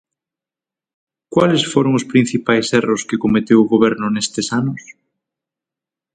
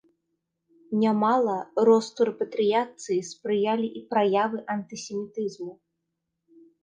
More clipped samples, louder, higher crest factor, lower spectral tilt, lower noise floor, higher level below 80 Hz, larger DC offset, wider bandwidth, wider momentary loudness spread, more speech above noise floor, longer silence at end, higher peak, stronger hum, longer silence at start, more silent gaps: neither; first, -16 LUFS vs -25 LUFS; about the same, 18 dB vs 18 dB; about the same, -5 dB/octave vs -5.5 dB/octave; first, -89 dBFS vs -81 dBFS; first, -54 dBFS vs -76 dBFS; neither; about the same, 9.4 kHz vs 9.6 kHz; second, 7 LU vs 12 LU; first, 73 dB vs 56 dB; first, 1.25 s vs 1.1 s; first, 0 dBFS vs -8 dBFS; neither; first, 1.3 s vs 0.9 s; neither